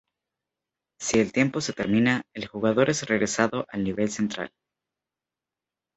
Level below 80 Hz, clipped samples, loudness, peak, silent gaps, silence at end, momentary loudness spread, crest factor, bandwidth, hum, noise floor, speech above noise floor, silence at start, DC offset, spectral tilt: -58 dBFS; under 0.1%; -25 LUFS; -4 dBFS; none; 1.5 s; 8 LU; 22 dB; 8.2 kHz; none; -89 dBFS; 64 dB; 1 s; under 0.1%; -4.5 dB/octave